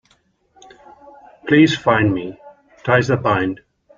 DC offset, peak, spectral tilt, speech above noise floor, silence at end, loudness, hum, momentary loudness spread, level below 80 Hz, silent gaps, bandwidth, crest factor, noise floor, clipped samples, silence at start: under 0.1%; -2 dBFS; -6.5 dB/octave; 45 dB; 0.45 s; -17 LUFS; none; 19 LU; -52 dBFS; none; 7.4 kHz; 18 dB; -60 dBFS; under 0.1%; 1.45 s